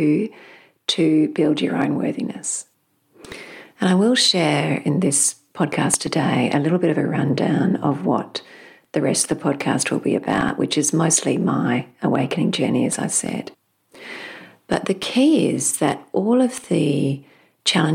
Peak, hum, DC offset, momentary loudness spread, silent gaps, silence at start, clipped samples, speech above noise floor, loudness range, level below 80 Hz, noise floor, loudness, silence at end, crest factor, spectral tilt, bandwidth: -4 dBFS; none; under 0.1%; 14 LU; none; 0 s; under 0.1%; 40 dB; 4 LU; -58 dBFS; -59 dBFS; -20 LUFS; 0 s; 16 dB; -4 dB/octave; 16 kHz